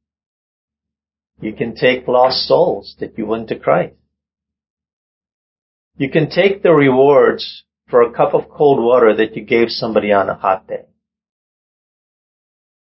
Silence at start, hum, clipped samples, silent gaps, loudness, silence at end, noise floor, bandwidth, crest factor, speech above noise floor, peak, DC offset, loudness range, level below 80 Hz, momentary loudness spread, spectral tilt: 1.4 s; none; under 0.1%; 4.70-4.77 s, 4.93-5.21 s, 5.34-5.91 s; -14 LUFS; 2.05 s; -86 dBFS; 5.8 kHz; 16 dB; 72 dB; 0 dBFS; under 0.1%; 8 LU; -54 dBFS; 14 LU; -9.5 dB/octave